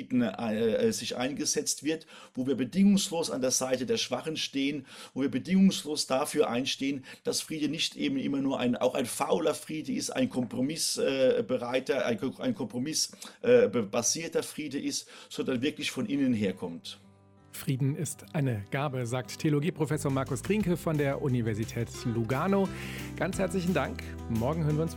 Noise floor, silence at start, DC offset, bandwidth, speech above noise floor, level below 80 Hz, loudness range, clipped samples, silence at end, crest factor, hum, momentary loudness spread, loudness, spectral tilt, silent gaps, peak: -58 dBFS; 0 s; under 0.1%; 16.5 kHz; 28 dB; -56 dBFS; 4 LU; under 0.1%; 0 s; 18 dB; none; 9 LU; -30 LUFS; -4.5 dB/octave; none; -12 dBFS